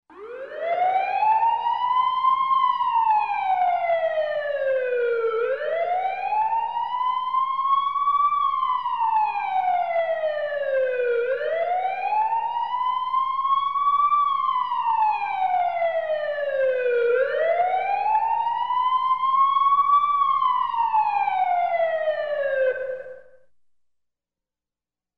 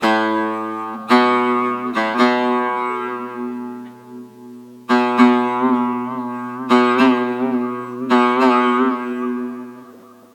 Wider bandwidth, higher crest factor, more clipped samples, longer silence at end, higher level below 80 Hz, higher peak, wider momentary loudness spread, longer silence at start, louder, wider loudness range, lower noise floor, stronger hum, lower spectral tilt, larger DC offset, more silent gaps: second, 5.8 kHz vs 10.5 kHz; second, 12 dB vs 18 dB; neither; first, 1.95 s vs 0.35 s; first, -66 dBFS vs -74 dBFS; second, -10 dBFS vs 0 dBFS; second, 5 LU vs 17 LU; about the same, 0.1 s vs 0 s; second, -22 LUFS vs -17 LUFS; about the same, 4 LU vs 4 LU; first, under -90 dBFS vs -43 dBFS; neither; second, -3.5 dB/octave vs -5 dB/octave; first, 0.3% vs under 0.1%; neither